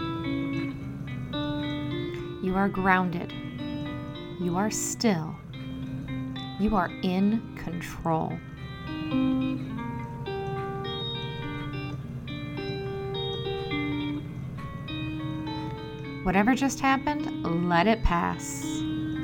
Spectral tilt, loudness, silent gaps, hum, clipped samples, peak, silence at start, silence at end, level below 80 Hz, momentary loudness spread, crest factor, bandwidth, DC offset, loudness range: -5.5 dB/octave; -29 LUFS; none; none; under 0.1%; -6 dBFS; 0 s; 0 s; -44 dBFS; 12 LU; 22 dB; 17.5 kHz; under 0.1%; 7 LU